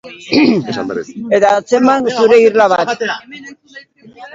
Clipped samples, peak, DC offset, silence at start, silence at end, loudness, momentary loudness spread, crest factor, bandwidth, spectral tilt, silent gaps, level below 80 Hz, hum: under 0.1%; 0 dBFS; under 0.1%; 0.05 s; 0.05 s; -12 LUFS; 14 LU; 14 dB; 7.8 kHz; -5 dB/octave; none; -56 dBFS; none